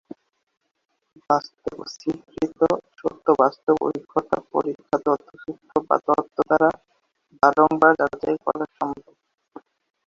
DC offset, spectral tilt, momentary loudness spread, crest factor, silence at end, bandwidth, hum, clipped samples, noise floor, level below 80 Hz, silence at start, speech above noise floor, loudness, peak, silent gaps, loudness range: under 0.1%; -6.5 dB/octave; 13 LU; 22 dB; 1.1 s; 7.4 kHz; none; under 0.1%; -69 dBFS; -60 dBFS; 1.3 s; 47 dB; -22 LUFS; -2 dBFS; none; 4 LU